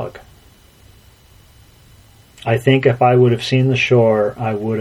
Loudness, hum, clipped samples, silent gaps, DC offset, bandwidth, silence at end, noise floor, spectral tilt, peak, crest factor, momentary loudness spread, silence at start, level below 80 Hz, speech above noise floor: -15 LUFS; none; under 0.1%; none; under 0.1%; 12 kHz; 0 s; -47 dBFS; -7 dB/octave; 0 dBFS; 18 dB; 9 LU; 0 s; -50 dBFS; 33 dB